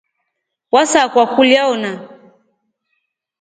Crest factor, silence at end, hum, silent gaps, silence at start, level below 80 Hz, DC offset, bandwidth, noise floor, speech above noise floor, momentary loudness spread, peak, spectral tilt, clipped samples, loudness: 16 dB; 1.3 s; none; none; 0.75 s; -62 dBFS; under 0.1%; 9.6 kHz; -75 dBFS; 62 dB; 12 LU; 0 dBFS; -2.5 dB/octave; under 0.1%; -13 LUFS